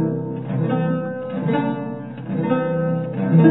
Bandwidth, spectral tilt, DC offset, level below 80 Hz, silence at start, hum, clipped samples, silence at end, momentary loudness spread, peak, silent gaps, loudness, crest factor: 4 kHz; -13 dB/octave; 0.2%; -66 dBFS; 0 s; none; under 0.1%; 0 s; 8 LU; -2 dBFS; none; -22 LUFS; 18 dB